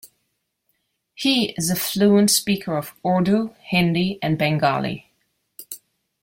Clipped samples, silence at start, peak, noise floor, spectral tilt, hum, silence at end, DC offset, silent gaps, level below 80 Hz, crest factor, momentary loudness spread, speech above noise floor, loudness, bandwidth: under 0.1%; 0.05 s; -4 dBFS; -74 dBFS; -4.5 dB/octave; none; 0.45 s; under 0.1%; none; -58 dBFS; 18 dB; 17 LU; 54 dB; -20 LUFS; 16.5 kHz